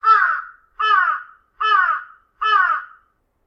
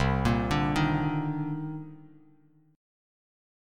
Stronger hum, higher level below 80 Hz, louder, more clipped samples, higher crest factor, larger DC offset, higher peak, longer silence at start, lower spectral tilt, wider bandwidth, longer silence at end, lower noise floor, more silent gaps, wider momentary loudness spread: neither; second, -62 dBFS vs -42 dBFS; first, -18 LUFS vs -28 LUFS; neither; about the same, 16 dB vs 18 dB; neither; first, -4 dBFS vs -12 dBFS; about the same, 0.05 s vs 0 s; second, 0.5 dB/octave vs -7 dB/octave; second, 6.6 kHz vs 13 kHz; second, 0.6 s vs 1.55 s; about the same, -61 dBFS vs -61 dBFS; neither; about the same, 11 LU vs 13 LU